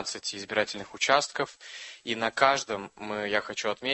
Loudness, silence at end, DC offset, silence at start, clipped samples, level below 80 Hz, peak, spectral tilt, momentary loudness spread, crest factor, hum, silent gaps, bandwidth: -28 LUFS; 0 s; under 0.1%; 0 s; under 0.1%; -66 dBFS; -6 dBFS; -2 dB/octave; 12 LU; 24 dB; none; none; 8.6 kHz